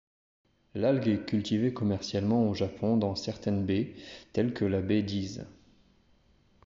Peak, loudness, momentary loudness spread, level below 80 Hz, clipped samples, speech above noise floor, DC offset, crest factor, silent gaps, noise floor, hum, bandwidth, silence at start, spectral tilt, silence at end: -14 dBFS; -30 LUFS; 11 LU; -62 dBFS; under 0.1%; 36 dB; under 0.1%; 16 dB; none; -65 dBFS; none; 7.6 kHz; 0.75 s; -6.5 dB/octave; 1.15 s